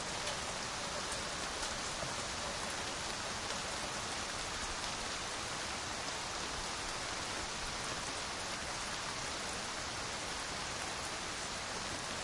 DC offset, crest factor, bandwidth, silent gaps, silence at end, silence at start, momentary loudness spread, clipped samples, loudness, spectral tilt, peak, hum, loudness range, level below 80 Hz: under 0.1%; 20 dB; 11.5 kHz; none; 0 s; 0 s; 1 LU; under 0.1%; -38 LUFS; -1.5 dB/octave; -20 dBFS; none; 1 LU; -56 dBFS